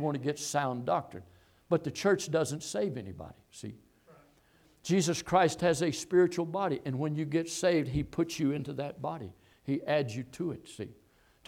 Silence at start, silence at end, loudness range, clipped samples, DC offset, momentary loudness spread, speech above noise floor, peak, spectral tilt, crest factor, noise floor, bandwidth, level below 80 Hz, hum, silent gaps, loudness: 0 s; 0.55 s; 5 LU; under 0.1%; under 0.1%; 18 LU; 34 dB; -12 dBFS; -5 dB/octave; 20 dB; -65 dBFS; 16 kHz; -60 dBFS; none; none; -31 LUFS